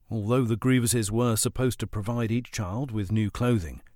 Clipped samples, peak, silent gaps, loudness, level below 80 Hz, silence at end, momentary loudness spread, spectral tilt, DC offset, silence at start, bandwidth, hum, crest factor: under 0.1%; -12 dBFS; none; -26 LUFS; -46 dBFS; 0.15 s; 7 LU; -5.5 dB/octave; under 0.1%; 0.1 s; 18.5 kHz; none; 14 dB